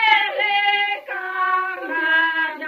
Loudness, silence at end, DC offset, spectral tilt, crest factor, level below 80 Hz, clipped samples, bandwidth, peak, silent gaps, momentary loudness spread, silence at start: -19 LUFS; 0 s; under 0.1%; -1 dB/octave; 18 dB; -76 dBFS; under 0.1%; 15 kHz; -2 dBFS; none; 7 LU; 0 s